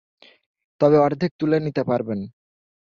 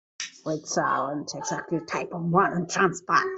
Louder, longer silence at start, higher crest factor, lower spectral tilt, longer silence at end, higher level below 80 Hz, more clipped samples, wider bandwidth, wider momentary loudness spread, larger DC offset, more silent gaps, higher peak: first, -21 LUFS vs -26 LUFS; first, 0.8 s vs 0.2 s; about the same, 18 dB vs 22 dB; first, -9 dB/octave vs -4.5 dB/octave; first, 0.6 s vs 0 s; first, -60 dBFS vs -66 dBFS; neither; second, 6.8 kHz vs 8.2 kHz; first, 13 LU vs 9 LU; neither; first, 1.31-1.39 s vs none; about the same, -4 dBFS vs -6 dBFS